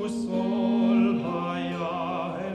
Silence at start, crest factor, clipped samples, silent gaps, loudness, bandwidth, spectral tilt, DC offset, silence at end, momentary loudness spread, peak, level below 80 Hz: 0 s; 14 dB; under 0.1%; none; -26 LUFS; 9.8 kHz; -7 dB/octave; under 0.1%; 0 s; 8 LU; -12 dBFS; -62 dBFS